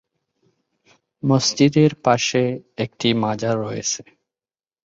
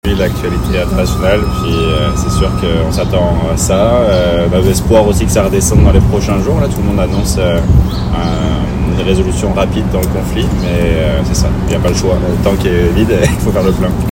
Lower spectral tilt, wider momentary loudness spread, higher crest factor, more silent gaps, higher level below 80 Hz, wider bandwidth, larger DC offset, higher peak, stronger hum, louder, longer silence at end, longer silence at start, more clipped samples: about the same, -5 dB/octave vs -6 dB/octave; first, 11 LU vs 5 LU; first, 20 dB vs 10 dB; neither; second, -58 dBFS vs -18 dBFS; second, 7.8 kHz vs 17 kHz; neither; about the same, -2 dBFS vs 0 dBFS; neither; second, -20 LUFS vs -12 LUFS; first, 0.85 s vs 0 s; first, 1.25 s vs 0.05 s; second, under 0.1% vs 0.5%